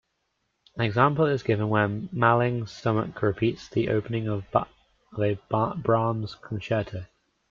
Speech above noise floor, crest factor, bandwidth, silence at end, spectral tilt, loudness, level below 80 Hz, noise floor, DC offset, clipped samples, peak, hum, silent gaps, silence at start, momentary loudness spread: 51 dB; 20 dB; 7.2 kHz; 0.45 s; -8 dB/octave; -26 LUFS; -58 dBFS; -76 dBFS; under 0.1%; under 0.1%; -6 dBFS; none; none; 0.75 s; 12 LU